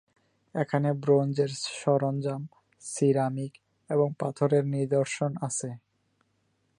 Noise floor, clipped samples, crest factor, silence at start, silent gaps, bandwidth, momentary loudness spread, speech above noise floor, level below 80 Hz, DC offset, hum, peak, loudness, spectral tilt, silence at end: -73 dBFS; under 0.1%; 18 dB; 0.55 s; none; 11.5 kHz; 14 LU; 46 dB; -76 dBFS; under 0.1%; none; -10 dBFS; -28 LUFS; -6 dB/octave; 1 s